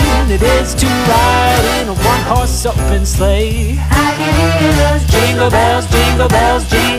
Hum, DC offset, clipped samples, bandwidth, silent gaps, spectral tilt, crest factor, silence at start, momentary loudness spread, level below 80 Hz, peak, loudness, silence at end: none; under 0.1%; under 0.1%; 15.5 kHz; none; -4.5 dB/octave; 10 dB; 0 s; 4 LU; -16 dBFS; 0 dBFS; -12 LUFS; 0 s